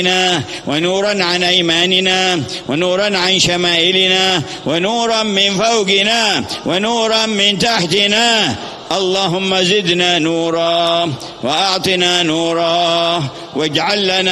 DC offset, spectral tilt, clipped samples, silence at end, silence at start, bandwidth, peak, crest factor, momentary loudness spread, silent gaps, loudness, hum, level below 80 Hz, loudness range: under 0.1%; -3 dB/octave; under 0.1%; 0 s; 0 s; 13.5 kHz; 0 dBFS; 14 dB; 7 LU; none; -13 LUFS; none; -52 dBFS; 2 LU